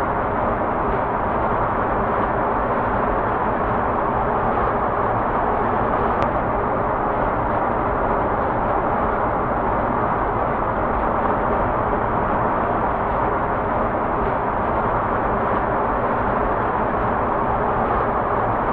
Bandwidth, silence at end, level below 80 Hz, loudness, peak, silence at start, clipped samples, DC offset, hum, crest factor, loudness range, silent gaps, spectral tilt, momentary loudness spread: 5 kHz; 0 s; -34 dBFS; -21 LUFS; 0 dBFS; 0 s; under 0.1%; under 0.1%; none; 20 dB; 0 LU; none; -10 dB/octave; 1 LU